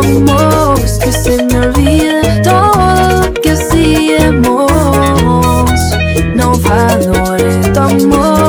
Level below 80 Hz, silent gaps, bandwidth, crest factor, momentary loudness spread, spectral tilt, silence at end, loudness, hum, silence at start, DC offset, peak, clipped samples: -18 dBFS; none; over 20 kHz; 8 dB; 3 LU; -5.5 dB/octave; 0 s; -9 LUFS; none; 0 s; under 0.1%; 0 dBFS; 0.6%